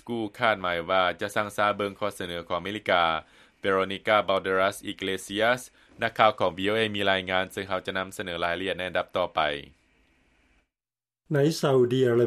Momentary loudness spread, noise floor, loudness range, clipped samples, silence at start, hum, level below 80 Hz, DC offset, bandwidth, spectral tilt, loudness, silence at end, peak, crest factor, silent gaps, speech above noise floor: 9 LU; under -90 dBFS; 5 LU; under 0.1%; 0.05 s; none; -62 dBFS; under 0.1%; 14.5 kHz; -5 dB/octave; -26 LUFS; 0 s; -4 dBFS; 24 dB; none; over 64 dB